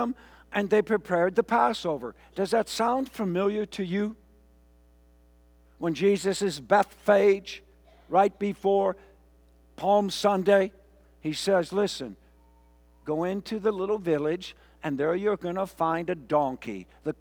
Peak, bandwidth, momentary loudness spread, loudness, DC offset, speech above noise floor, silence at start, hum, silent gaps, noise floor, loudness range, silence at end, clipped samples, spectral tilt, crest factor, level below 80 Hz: -8 dBFS; 20 kHz; 12 LU; -27 LUFS; under 0.1%; 32 dB; 0 s; 60 Hz at -60 dBFS; none; -58 dBFS; 5 LU; 0.1 s; under 0.1%; -5.5 dB/octave; 20 dB; -60 dBFS